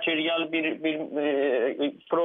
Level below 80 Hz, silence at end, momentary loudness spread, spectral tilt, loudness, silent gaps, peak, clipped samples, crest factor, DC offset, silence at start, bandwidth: -82 dBFS; 0 s; 4 LU; -7.5 dB/octave; -27 LUFS; none; -14 dBFS; under 0.1%; 12 dB; under 0.1%; 0 s; 3.9 kHz